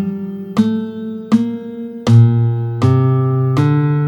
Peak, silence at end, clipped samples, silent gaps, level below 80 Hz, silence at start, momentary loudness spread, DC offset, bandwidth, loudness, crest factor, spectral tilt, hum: 0 dBFS; 0 s; under 0.1%; none; -50 dBFS; 0 s; 14 LU; under 0.1%; 7.8 kHz; -15 LUFS; 14 dB; -9 dB/octave; none